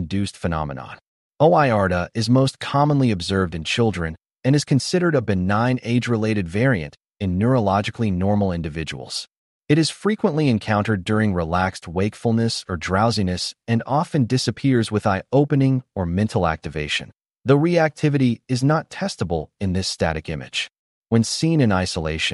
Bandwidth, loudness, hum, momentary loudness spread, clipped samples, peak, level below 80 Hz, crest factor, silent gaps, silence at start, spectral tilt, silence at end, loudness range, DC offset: 11.5 kHz; -21 LUFS; none; 8 LU; under 0.1%; -4 dBFS; -44 dBFS; 16 dB; 1.07-1.31 s, 9.37-9.61 s, 20.79-21.02 s; 0 s; -6 dB/octave; 0 s; 2 LU; under 0.1%